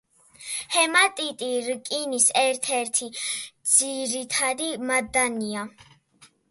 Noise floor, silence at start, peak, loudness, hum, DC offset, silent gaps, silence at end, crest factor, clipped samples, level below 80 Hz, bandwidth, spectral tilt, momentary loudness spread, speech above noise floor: -57 dBFS; 0.4 s; -4 dBFS; -23 LUFS; none; under 0.1%; none; 0.25 s; 22 dB; under 0.1%; -66 dBFS; 12 kHz; -0.5 dB/octave; 12 LU; 33 dB